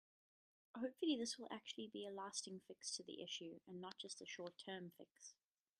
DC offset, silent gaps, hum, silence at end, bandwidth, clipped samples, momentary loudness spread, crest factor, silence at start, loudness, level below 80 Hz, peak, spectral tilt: under 0.1%; 5.11-5.15 s; none; 0.5 s; 13 kHz; under 0.1%; 16 LU; 22 dB; 0.75 s; -49 LUFS; under -90 dBFS; -30 dBFS; -3 dB/octave